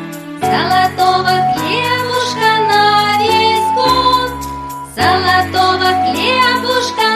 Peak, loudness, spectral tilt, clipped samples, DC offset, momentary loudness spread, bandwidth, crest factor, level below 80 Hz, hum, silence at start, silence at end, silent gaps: 0 dBFS; -12 LUFS; -3.5 dB/octave; under 0.1%; under 0.1%; 7 LU; 15.5 kHz; 12 dB; -42 dBFS; none; 0 s; 0 s; none